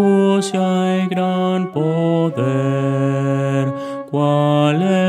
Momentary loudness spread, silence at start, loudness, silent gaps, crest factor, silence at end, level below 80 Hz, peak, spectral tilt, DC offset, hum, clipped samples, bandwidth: 4 LU; 0 s; -17 LUFS; none; 14 dB; 0 s; -68 dBFS; -2 dBFS; -7 dB/octave; under 0.1%; none; under 0.1%; 11.5 kHz